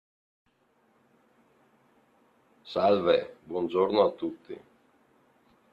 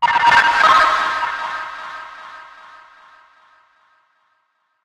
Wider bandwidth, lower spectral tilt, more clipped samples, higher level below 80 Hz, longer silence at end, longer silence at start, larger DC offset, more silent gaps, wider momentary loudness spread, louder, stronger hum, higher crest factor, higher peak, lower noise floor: second, 5.6 kHz vs 13.5 kHz; first, -7.5 dB/octave vs -1 dB/octave; neither; second, -72 dBFS vs -54 dBFS; second, 1.15 s vs 2.4 s; first, 2.65 s vs 0 s; neither; neither; second, 20 LU vs 24 LU; second, -27 LUFS vs -14 LUFS; neither; about the same, 22 dB vs 18 dB; second, -10 dBFS vs -2 dBFS; about the same, -68 dBFS vs -67 dBFS